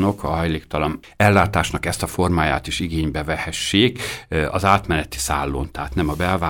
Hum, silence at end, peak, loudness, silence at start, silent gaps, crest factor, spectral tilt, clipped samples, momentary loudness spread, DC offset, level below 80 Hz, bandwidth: none; 0 s; 0 dBFS; -20 LUFS; 0 s; none; 20 dB; -5 dB/octave; under 0.1%; 7 LU; under 0.1%; -34 dBFS; 19 kHz